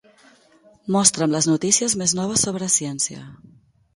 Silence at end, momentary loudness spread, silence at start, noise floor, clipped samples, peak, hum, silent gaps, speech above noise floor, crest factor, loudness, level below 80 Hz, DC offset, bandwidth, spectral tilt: 0.6 s; 8 LU; 0.85 s; -54 dBFS; under 0.1%; 0 dBFS; none; none; 33 dB; 22 dB; -19 LUFS; -58 dBFS; under 0.1%; 12 kHz; -3 dB/octave